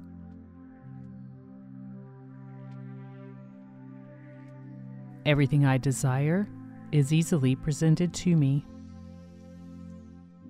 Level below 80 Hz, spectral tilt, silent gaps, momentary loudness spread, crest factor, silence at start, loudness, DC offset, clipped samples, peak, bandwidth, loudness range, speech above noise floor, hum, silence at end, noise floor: -56 dBFS; -6.5 dB/octave; none; 23 LU; 18 dB; 0 s; -26 LUFS; under 0.1%; under 0.1%; -12 dBFS; 14 kHz; 20 LU; 24 dB; none; 0 s; -48 dBFS